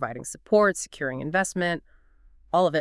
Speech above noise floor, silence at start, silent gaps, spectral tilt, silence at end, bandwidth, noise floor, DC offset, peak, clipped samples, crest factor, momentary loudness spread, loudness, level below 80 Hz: 31 dB; 0 s; none; -4.5 dB/octave; 0 s; 12 kHz; -55 dBFS; under 0.1%; -8 dBFS; under 0.1%; 18 dB; 11 LU; -25 LUFS; -56 dBFS